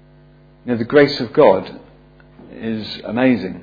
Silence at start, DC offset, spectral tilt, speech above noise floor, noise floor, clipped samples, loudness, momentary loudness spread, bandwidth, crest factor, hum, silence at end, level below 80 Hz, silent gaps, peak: 0.65 s; under 0.1%; -7.5 dB/octave; 31 dB; -47 dBFS; under 0.1%; -16 LUFS; 15 LU; 5 kHz; 18 dB; none; 0 s; -52 dBFS; none; 0 dBFS